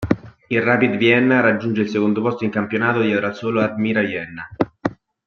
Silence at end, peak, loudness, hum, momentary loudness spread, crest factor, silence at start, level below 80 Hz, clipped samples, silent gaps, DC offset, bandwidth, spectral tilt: 0.3 s; -2 dBFS; -19 LUFS; none; 10 LU; 16 dB; 0 s; -52 dBFS; under 0.1%; none; under 0.1%; 6.8 kHz; -7.5 dB/octave